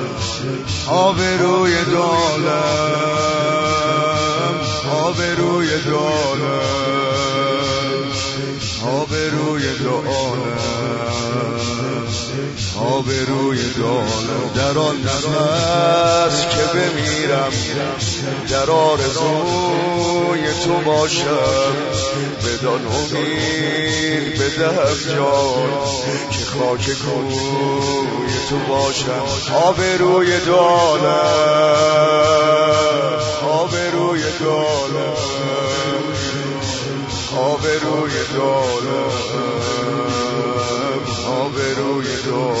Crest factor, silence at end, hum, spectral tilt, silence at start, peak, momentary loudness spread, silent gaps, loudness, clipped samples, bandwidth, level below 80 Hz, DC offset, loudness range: 14 dB; 0 s; none; -4.5 dB/octave; 0 s; -2 dBFS; 7 LU; none; -17 LUFS; under 0.1%; 8 kHz; -46 dBFS; under 0.1%; 5 LU